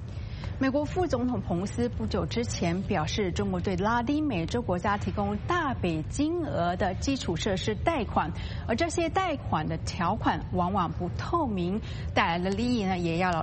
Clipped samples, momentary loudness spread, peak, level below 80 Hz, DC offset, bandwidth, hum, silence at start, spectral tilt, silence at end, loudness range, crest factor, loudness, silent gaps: under 0.1%; 4 LU; -10 dBFS; -42 dBFS; under 0.1%; 8.4 kHz; none; 0 s; -6 dB/octave; 0 s; 1 LU; 18 dB; -29 LUFS; none